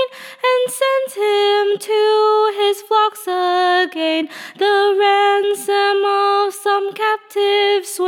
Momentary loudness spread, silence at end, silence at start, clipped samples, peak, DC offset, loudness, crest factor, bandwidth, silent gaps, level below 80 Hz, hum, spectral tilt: 5 LU; 0 s; 0 s; under 0.1%; -4 dBFS; under 0.1%; -16 LUFS; 12 dB; 16.5 kHz; none; -86 dBFS; none; -1 dB/octave